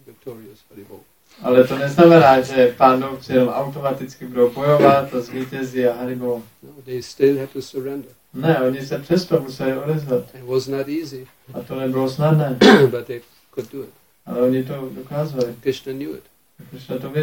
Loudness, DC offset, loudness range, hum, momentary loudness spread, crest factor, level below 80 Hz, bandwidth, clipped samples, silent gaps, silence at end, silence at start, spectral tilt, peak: -18 LUFS; under 0.1%; 8 LU; none; 20 LU; 18 dB; -56 dBFS; 17 kHz; under 0.1%; none; 0 s; 0.25 s; -6.5 dB/octave; 0 dBFS